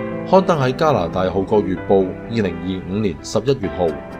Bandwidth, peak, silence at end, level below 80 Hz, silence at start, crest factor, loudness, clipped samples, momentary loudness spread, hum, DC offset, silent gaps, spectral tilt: 12 kHz; 0 dBFS; 0 s; -42 dBFS; 0 s; 18 dB; -19 LUFS; under 0.1%; 7 LU; none; under 0.1%; none; -7 dB/octave